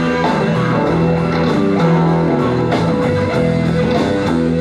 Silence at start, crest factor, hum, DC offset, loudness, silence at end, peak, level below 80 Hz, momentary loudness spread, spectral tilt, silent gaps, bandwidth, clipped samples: 0 s; 10 dB; none; under 0.1%; -15 LUFS; 0 s; -4 dBFS; -40 dBFS; 2 LU; -7.5 dB/octave; none; 9.6 kHz; under 0.1%